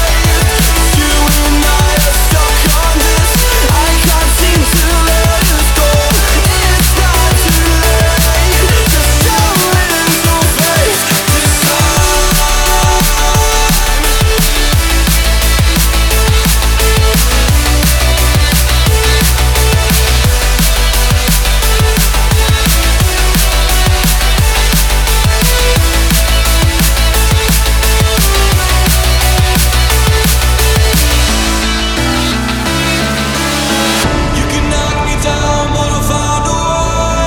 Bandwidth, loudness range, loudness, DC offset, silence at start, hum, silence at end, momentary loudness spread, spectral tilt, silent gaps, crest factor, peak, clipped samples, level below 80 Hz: over 20 kHz; 2 LU; -10 LUFS; under 0.1%; 0 s; none; 0 s; 3 LU; -3.5 dB/octave; none; 10 dB; 0 dBFS; under 0.1%; -12 dBFS